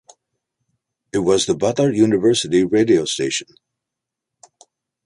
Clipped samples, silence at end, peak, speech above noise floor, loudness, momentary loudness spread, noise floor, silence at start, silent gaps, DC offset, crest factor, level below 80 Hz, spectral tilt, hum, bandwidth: under 0.1%; 1.65 s; -4 dBFS; 67 dB; -17 LUFS; 7 LU; -83 dBFS; 1.15 s; none; under 0.1%; 16 dB; -56 dBFS; -4.5 dB/octave; none; 11.5 kHz